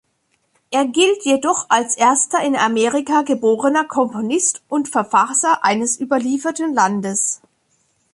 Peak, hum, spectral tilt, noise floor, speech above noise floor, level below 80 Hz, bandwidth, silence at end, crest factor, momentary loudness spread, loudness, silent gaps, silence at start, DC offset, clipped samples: -2 dBFS; none; -2.5 dB/octave; -66 dBFS; 49 dB; -66 dBFS; 11.5 kHz; 0.75 s; 16 dB; 5 LU; -17 LUFS; none; 0.7 s; under 0.1%; under 0.1%